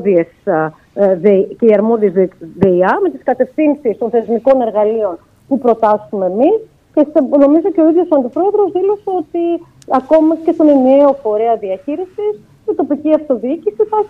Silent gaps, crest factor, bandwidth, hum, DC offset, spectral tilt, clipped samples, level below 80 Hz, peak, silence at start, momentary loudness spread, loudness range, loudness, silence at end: none; 12 dB; 5.6 kHz; none; under 0.1%; -9.5 dB/octave; under 0.1%; -54 dBFS; 0 dBFS; 0 s; 9 LU; 2 LU; -13 LUFS; 0 s